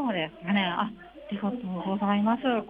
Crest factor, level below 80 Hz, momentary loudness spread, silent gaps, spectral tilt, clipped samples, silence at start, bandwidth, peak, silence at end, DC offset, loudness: 16 dB; -62 dBFS; 9 LU; none; -8.5 dB/octave; under 0.1%; 0 s; 3.9 kHz; -12 dBFS; 0 s; under 0.1%; -28 LUFS